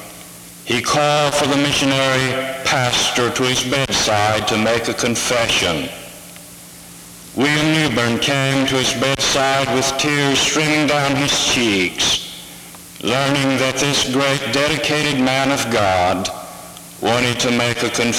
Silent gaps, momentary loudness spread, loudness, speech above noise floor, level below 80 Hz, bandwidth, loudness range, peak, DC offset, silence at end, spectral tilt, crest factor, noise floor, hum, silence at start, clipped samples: none; 19 LU; -16 LUFS; 21 dB; -46 dBFS; 18.5 kHz; 3 LU; -4 dBFS; under 0.1%; 0 s; -3 dB/octave; 14 dB; -38 dBFS; none; 0 s; under 0.1%